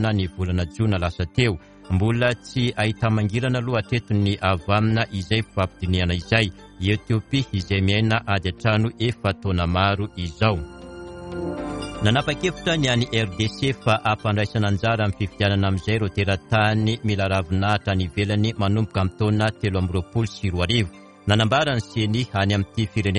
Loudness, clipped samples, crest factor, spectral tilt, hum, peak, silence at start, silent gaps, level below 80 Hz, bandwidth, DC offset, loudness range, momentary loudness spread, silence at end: -22 LUFS; under 0.1%; 20 dB; -6 dB/octave; none; -2 dBFS; 0 s; none; -42 dBFS; 10.5 kHz; under 0.1%; 2 LU; 5 LU; 0 s